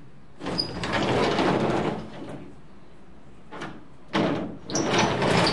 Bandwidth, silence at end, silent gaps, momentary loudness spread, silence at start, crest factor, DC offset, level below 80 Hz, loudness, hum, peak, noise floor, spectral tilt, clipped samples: 11.5 kHz; 0 s; none; 17 LU; 0 s; 18 dB; 0.8%; -50 dBFS; -25 LUFS; none; -8 dBFS; -50 dBFS; -4.5 dB/octave; under 0.1%